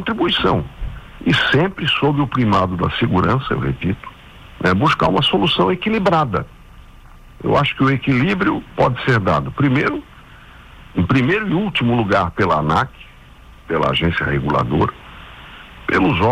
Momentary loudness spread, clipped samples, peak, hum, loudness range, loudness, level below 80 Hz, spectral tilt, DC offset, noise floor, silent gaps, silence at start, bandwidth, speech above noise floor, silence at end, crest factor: 12 LU; under 0.1%; -6 dBFS; none; 1 LU; -17 LUFS; -38 dBFS; -7 dB/octave; under 0.1%; -42 dBFS; none; 0 s; 11 kHz; 25 dB; 0 s; 12 dB